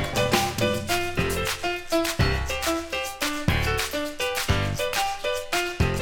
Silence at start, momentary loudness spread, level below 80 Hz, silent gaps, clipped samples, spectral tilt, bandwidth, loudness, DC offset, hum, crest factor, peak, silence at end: 0 s; 5 LU; -36 dBFS; none; under 0.1%; -4 dB/octave; 19 kHz; -25 LUFS; under 0.1%; none; 18 dB; -8 dBFS; 0 s